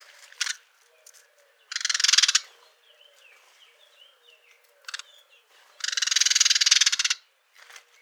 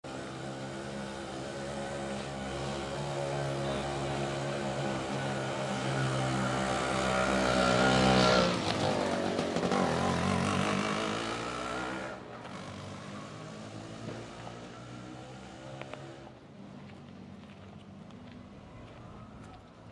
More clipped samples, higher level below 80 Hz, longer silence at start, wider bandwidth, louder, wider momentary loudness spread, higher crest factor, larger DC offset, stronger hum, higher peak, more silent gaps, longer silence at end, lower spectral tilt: neither; second, under -90 dBFS vs -54 dBFS; first, 0.4 s vs 0.05 s; first, over 20 kHz vs 11.5 kHz; first, -21 LUFS vs -32 LUFS; about the same, 21 LU vs 22 LU; first, 28 dB vs 22 dB; neither; neither; first, 0 dBFS vs -12 dBFS; neither; first, 0.85 s vs 0 s; second, 10.5 dB/octave vs -5 dB/octave